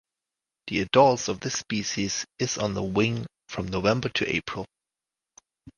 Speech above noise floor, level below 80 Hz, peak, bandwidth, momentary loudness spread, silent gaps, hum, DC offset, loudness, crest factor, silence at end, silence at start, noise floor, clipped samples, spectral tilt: 63 dB; -54 dBFS; -4 dBFS; 11 kHz; 15 LU; none; none; under 0.1%; -26 LUFS; 24 dB; 0.05 s; 0.65 s; -89 dBFS; under 0.1%; -4 dB/octave